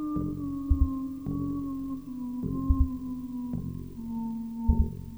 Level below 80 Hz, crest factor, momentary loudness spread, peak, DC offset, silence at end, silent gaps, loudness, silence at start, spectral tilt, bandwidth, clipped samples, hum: -34 dBFS; 20 dB; 9 LU; -10 dBFS; under 0.1%; 0 s; none; -32 LUFS; 0 s; -10.5 dB/octave; over 20 kHz; under 0.1%; none